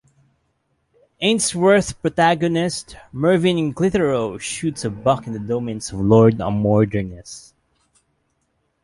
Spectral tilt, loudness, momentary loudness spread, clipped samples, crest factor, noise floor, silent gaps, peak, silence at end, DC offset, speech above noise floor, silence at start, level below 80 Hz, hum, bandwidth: -5.5 dB/octave; -19 LUFS; 11 LU; under 0.1%; 18 dB; -69 dBFS; none; -2 dBFS; 1.45 s; under 0.1%; 50 dB; 1.2 s; -46 dBFS; none; 11.5 kHz